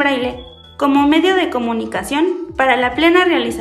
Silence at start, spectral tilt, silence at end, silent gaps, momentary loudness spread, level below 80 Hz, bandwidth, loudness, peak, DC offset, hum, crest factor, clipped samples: 0 s; -4 dB/octave; 0 s; none; 8 LU; -44 dBFS; 13.5 kHz; -15 LUFS; 0 dBFS; under 0.1%; none; 14 dB; under 0.1%